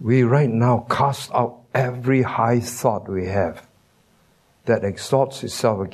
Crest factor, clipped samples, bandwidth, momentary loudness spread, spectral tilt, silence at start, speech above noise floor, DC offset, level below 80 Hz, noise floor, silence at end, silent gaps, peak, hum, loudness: 18 dB; under 0.1%; 13.5 kHz; 7 LU; -6.5 dB/octave; 0 s; 39 dB; under 0.1%; -56 dBFS; -59 dBFS; 0 s; none; -2 dBFS; none; -21 LUFS